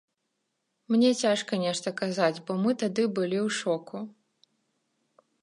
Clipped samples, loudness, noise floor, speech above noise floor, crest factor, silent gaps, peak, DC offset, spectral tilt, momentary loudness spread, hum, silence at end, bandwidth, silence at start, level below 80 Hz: under 0.1%; -27 LUFS; -79 dBFS; 53 dB; 20 dB; none; -10 dBFS; under 0.1%; -4.5 dB/octave; 9 LU; none; 1.35 s; 11.5 kHz; 0.9 s; -80 dBFS